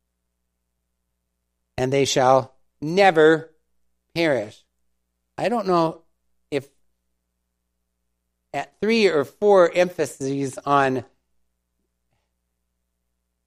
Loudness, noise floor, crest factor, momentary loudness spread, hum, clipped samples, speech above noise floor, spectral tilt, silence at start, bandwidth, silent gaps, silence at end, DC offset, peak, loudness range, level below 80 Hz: -20 LUFS; -76 dBFS; 22 dB; 15 LU; 60 Hz at -60 dBFS; under 0.1%; 57 dB; -5 dB/octave; 1.75 s; 15 kHz; none; 2.45 s; under 0.1%; -2 dBFS; 8 LU; -62 dBFS